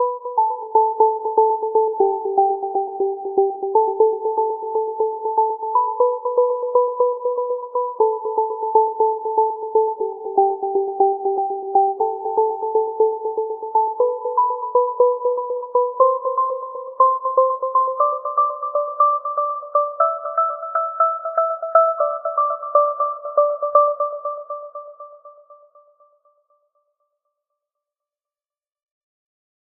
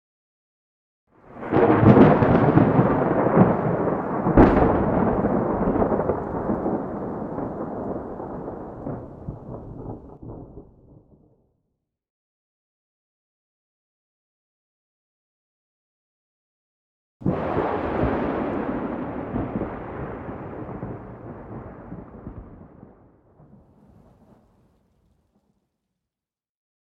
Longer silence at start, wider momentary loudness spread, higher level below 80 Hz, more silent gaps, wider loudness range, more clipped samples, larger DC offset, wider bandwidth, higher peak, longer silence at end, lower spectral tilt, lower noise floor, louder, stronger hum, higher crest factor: second, 0 s vs 1.3 s; second, 7 LU vs 23 LU; second, -78 dBFS vs -40 dBFS; second, none vs 12.10-17.20 s; second, 2 LU vs 22 LU; neither; neither; second, 1.8 kHz vs 5.6 kHz; about the same, 0 dBFS vs -2 dBFS; second, 4.05 s vs 4.2 s; second, 2 dB/octave vs -11 dB/octave; about the same, under -90 dBFS vs under -90 dBFS; about the same, -20 LUFS vs -21 LUFS; neither; about the same, 20 dB vs 22 dB